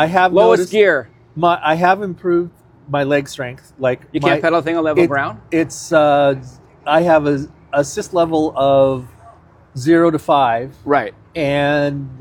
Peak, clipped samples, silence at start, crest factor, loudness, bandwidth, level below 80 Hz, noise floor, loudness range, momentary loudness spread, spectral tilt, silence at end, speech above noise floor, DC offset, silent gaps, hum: 0 dBFS; under 0.1%; 0 s; 16 dB; -16 LUFS; 15.5 kHz; -50 dBFS; -45 dBFS; 2 LU; 10 LU; -6 dB/octave; 0.05 s; 30 dB; under 0.1%; none; none